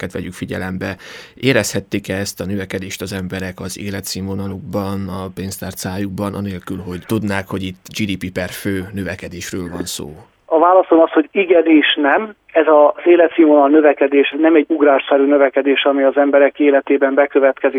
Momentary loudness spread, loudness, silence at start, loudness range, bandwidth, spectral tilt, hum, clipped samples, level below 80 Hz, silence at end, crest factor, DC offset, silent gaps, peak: 15 LU; -15 LUFS; 0 s; 12 LU; 19 kHz; -5 dB/octave; none; under 0.1%; -52 dBFS; 0 s; 16 dB; under 0.1%; none; 0 dBFS